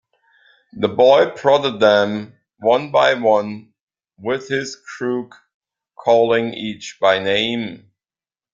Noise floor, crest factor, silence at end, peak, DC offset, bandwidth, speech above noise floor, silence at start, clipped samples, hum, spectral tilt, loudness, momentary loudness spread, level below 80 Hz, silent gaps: under -90 dBFS; 18 dB; 0.75 s; 0 dBFS; under 0.1%; 7.6 kHz; over 73 dB; 0.75 s; under 0.1%; none; -4.5 dB/octave; -17 LUFS; 14 LU; -62 dBFS; 3.81-3.88 s, 5.54-5.61 s